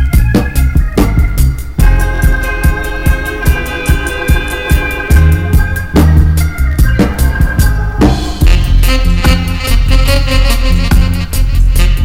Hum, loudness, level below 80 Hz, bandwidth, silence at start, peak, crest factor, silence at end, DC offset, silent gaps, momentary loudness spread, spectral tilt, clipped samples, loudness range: none; -12 LUFS; -10 dBFS; 16.5 kHz; 0 s; 0 dBFS; 8 dB; 0 s; under 0.1%; none; 4 LU; -5.5 dB/octave; 0.8%; 2 LU